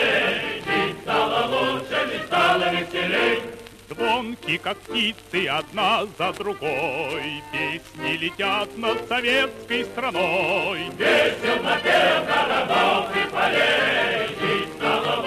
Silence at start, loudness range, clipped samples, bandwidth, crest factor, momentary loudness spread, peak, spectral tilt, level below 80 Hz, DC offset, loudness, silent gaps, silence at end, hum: 0 s; 5 LU; under 0.1%; 14 kHz; 16 dB; 8 LU; -8 dBFS; -4 dB/octave; -56 dBFS; under 0.1%; -22 LUFS; none; 0 s; none